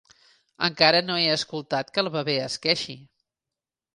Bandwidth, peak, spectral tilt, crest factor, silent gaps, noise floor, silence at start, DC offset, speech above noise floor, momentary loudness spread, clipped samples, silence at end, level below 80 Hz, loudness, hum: 11.5 kHz; -2 dBFS; -3.5 dB/octave; 24 dB; none; -89 dBFS; 0.6 s; under 0.1%; 64 dB; 10 LU; under 0.1%; 0.9 s; -68 dBFS; -23 LUFS; none